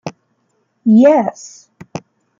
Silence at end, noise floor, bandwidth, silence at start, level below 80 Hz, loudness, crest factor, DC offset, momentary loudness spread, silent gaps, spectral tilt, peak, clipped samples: 0.4 s; -64 dBFS; 7.6 kHz; 0.05 s; -64 dBFS; -12 LUFS; 14 dB; under 0.1%; 23 LU; none; -7 dB/octave; -2 dBFS; under 0.1%